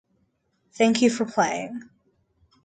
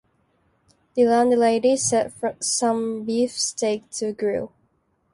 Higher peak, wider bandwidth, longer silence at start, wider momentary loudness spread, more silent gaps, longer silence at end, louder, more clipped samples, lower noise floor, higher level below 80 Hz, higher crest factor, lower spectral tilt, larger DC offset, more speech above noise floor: about the same, -8 dBFS vs -8 dBFS; second, 9.4 kHz vs 11.5 kHz; second, 0.75 s vs 0.95 s; first, 16 LU vs 10 LU; neither; first, 0.85 s vs 0.65 s; about the same, -23 LUFS vs -22 LUFS; neither; about the same, -70 dBFS vs -67 dBFS; second, -68 dBFS vs -62 dBFS; about the same, 18 dB vs 16 dB; about the same, -4 dB/octave vs -3 dB/octave; neither; about the same, 47 dB vs 46 dB